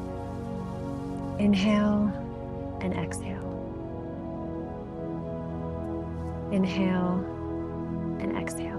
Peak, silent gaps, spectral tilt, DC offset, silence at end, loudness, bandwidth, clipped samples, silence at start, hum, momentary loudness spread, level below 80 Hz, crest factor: -14 dBFS; none; -7 dB/octave; under 0.1%; 0 s; -31 LUFS; 12.5 kHz; under 0.1%; 0 s; none; 12 LU; -46 dBFS; 16 dB